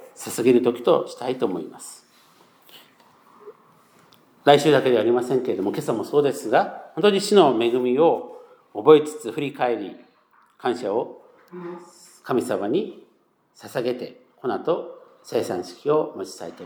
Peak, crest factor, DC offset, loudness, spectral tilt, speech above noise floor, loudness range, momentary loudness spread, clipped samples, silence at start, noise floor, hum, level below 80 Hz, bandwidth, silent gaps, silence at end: 0 dBFS; 22 dB; under 0.1%; -22 LUFS; -5 dB/octave; 41 dB; 9 LU; 20 LU; under 0.1%; 0 s; -63 dBFS; none; -82 dBFS; over 20 kHz; none; 0 s